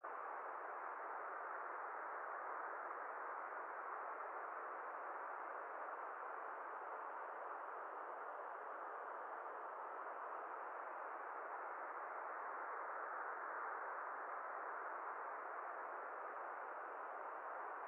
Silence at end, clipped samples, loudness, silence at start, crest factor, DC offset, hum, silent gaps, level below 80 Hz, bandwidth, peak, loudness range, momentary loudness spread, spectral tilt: 0 s; under 0.1%; -49 LUFS; 0 s; 14 dB; under 0.1%; none; none; under -90 dBFS; 3.6 kHz; -36 dBFS; 2 LU; 3 LU; 9 dB/octave